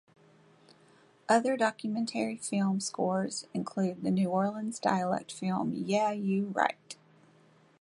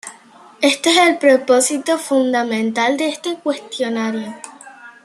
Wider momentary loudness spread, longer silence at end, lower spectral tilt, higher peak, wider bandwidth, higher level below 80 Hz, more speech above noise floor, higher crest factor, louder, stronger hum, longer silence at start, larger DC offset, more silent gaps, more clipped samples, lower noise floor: second, 7 LU vs 14 LU; first, 0.85 s vs 0.15 s; first, -5.5 dB/octave vs -2.5 dB/octave; second, -10 dBFS vs 0 dBFS; second, 11.5 kHz vs 13 kHz; second, -76 dBFS vs -70 dBFS; first, 32 dB vs 28 dB; about the same, 22 dB vs 18 dB; second, -31 LUFS vs -16 LUFS; neither; first, 1.3 s vs 0.05 s; neither; neither; neither; first, -62 dBFS vs -44 dBFS